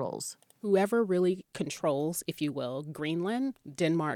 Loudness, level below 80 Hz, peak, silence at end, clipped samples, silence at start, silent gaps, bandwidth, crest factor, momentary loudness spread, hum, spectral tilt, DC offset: -31 LUFS; -74 dBFS; -14 dBFS; 0 s; under 0.1%; 0 s; none; 18 kHz; 16 dB; 10 LU; none; -5.5 dB/octave; under 0.1%